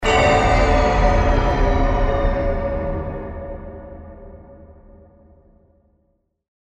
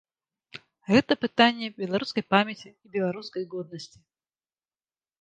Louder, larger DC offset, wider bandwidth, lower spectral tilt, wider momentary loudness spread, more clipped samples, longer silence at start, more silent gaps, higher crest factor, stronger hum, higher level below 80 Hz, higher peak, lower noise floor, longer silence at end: first, -19 LUFS vs -26 LUFS; neither; about the same, 8.6 kHz vs 9.2 kHz; about the same, -6 dB/octave vs -5.5 dB/octave; about the same, 22 LU vs 22 LU; neither; second, 0 s vs 0.55 s; neither; second, 16 dB vs 24 dB; neither; first, -24 dBFS vs -66 dBFS; about the same, -4 dBFS vs -4 dBFS; second, -66 dBFS vs under -90 dBFS; first, 2.1 s vs 1.35 s